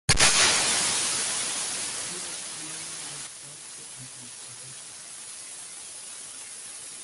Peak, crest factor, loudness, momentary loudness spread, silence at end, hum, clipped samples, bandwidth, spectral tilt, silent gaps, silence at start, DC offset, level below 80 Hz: -4 dBFS; 24 dB; -24 LUFS; 20 LU; 0 s; none; under 0.1%; 12 kHz; -0.5 dB/octave; none; 0.1 s; under 0.1%; -48 dBFS